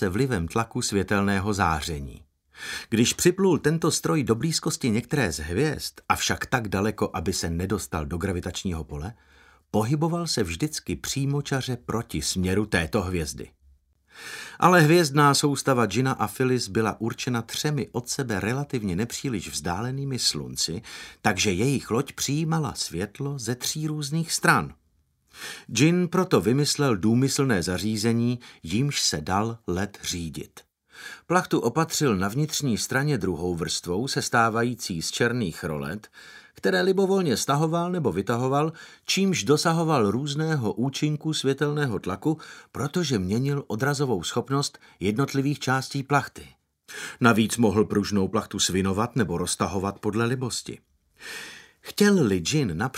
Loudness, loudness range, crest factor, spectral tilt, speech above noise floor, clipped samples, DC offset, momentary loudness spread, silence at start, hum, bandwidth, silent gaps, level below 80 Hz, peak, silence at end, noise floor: -25 LUFS; 5 LU; 24 dB; -4.5 dB/octave; 42 dB; under 0.1%; under 0.1%; 11 LU; 0 s; none; 16 kHz; none; -50 dBFS; -2 dBFS; 0 s; -67 dBFS